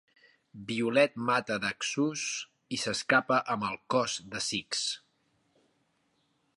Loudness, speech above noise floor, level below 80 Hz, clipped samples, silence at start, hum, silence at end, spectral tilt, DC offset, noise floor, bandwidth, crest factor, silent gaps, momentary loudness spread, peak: -30 LUFS; 44 dB; -72 dBFS; under 0.1%; 0.55 s; none; 1.6 s; -3 dB/octave; under 0.1%; -74 dBFS; 11.5 kHz; 22 dB; none; 9 LU; -10 dBFS